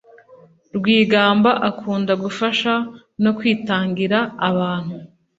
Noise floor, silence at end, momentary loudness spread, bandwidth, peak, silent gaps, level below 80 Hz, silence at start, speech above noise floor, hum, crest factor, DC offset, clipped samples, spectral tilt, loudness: -49 dBFS; 0.3 s; 11 LU; 7.8 kHz; -2 dBFS; none; -60 dBFS; 0.3 s; 31 dB; none; 18 dB; under 0.1%; under 0.1%; -6.5 dB/octave; -18 LUFS